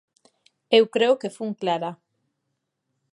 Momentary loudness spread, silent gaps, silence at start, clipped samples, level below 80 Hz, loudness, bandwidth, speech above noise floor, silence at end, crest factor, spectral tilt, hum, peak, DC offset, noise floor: 11 LU; none; 0.7 s; under 0.1%; -82 dBFS; -22 LUFS; 11.5 kHz; 57 dB; 1.2 s; 22 dB; -5 dB/octave; none; -4 dBFS; under 0.1%; -78 dBFS